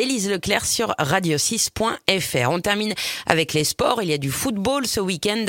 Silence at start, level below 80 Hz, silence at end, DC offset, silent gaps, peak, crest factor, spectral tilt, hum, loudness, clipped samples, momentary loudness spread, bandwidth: 0 s; -48 dBFS; 0 s; under 0.1%; none; 0 dBFS; 20 dB; -3 dB/octave; none; -21 LUFS; under 0.1%; 3 LU; 17 kHz